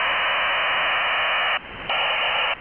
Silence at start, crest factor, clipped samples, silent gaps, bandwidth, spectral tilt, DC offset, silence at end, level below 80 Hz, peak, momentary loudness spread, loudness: 0 s; 12 dB; under 0.1%; none; 4 kHz; 3 dB/octave; 0.2%; 0 s; -54 dBFS; -12 dBFS; 3 LU; -20 LUFS